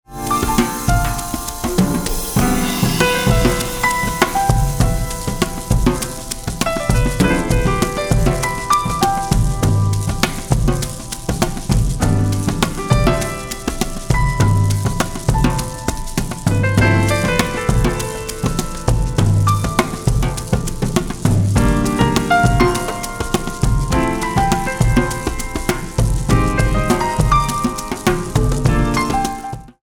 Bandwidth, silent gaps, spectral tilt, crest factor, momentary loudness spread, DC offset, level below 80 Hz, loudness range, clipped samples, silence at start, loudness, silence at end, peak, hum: over 20 kHz; none; -5 dB/octave; 16 dB; 7 LU; 0.1%; -24 dBFS; 2 LU; under 0.1%; 0.1 s; -18 LUFS; 0.15 s; 0 dBFS; none